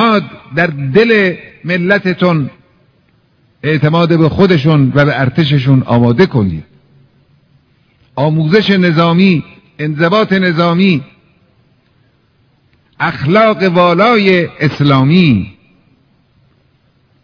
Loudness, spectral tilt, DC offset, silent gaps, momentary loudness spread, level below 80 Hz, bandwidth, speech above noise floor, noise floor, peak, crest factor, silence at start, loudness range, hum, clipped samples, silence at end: -11 LUFS; -8.5 dB/octave; under 0.1%; none; 9 LU; -44 dBFS; 5.4 kHz; 43 dB; -53 dBFS; 0 dBFS; 12 dB; 0 s; 4 LU; none; 0.7%; 1.7 s